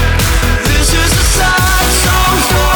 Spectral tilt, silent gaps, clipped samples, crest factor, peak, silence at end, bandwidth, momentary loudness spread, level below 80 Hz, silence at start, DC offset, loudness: -3 dB/octave; none; under 0.1%; 10 dB; 0 dBFS; 0 s; 19.5 kHz; 2 LU; -14 dBFS; 0 s; under 0.1%; -10 LUFS